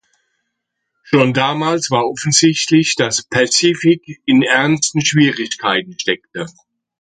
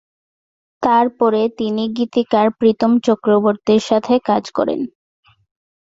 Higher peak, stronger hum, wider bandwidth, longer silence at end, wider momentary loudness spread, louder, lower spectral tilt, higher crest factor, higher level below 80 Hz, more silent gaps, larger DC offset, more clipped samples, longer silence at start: about the same, 0 dBFS vs -2 dBFS; neither; first, 9.4 kHz vs 7.8 kHz; second, 0.5 s vs 1.1 s; about the same, 8 LU vs 6 LU; about the same, -14 LUFS vs -16 LUFS; second, -3.5 dB/octave vs -6 dB/octave; about the same, 16 dB vs 16 dB; about the same, -58 dBFS vs -58 dBFS; neither; neither; neither; first, 1.1 s vs 0.8 s